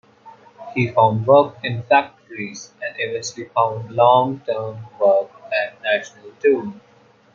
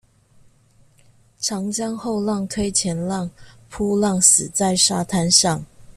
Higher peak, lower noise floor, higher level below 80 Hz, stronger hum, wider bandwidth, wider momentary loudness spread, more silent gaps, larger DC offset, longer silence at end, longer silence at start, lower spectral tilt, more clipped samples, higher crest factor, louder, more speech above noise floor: about the same, -2 dBFS vs 0 dBFS; second, -46 dBFS vs -55 dBFS; second, -66 dBFS vs -50 dBFS; neither; second, 7.6 kHz vs 14.5 kHz; first, 16 LU vs 13 LU; neither; neither; first, 0.55 s vs 0.05 s; second, 0.25 s vs 1.4 s; first, -5.5 dB/octave vs -3 dB/octave; neither; about the same, 18 dB vs 22 dB; about the same, -19 LUFS vs -18 LUFS; second, 28 dB vs 35 dB